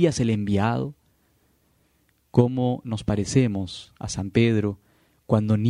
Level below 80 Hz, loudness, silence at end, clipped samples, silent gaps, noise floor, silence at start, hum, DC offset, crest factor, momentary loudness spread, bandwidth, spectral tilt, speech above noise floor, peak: -50 dBFS; -24 LUFS; 0 s; under 0.1%; none; -66 dBFS; 0 s; none; under 0.1%; 22 dB; 12 LU; 11 kHz; -6.5 dB/octave; 43 dB; -2 dBFS